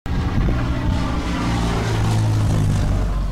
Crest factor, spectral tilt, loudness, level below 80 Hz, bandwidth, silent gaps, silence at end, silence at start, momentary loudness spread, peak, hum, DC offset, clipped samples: 12 dB; -6.5 dB/octave; -21 LUFS; -24 dBFS; 13 kHz; none; 0 s; 0.05 s; 4 LU; -6 dBFS; none; under 0.1%; under 0.1%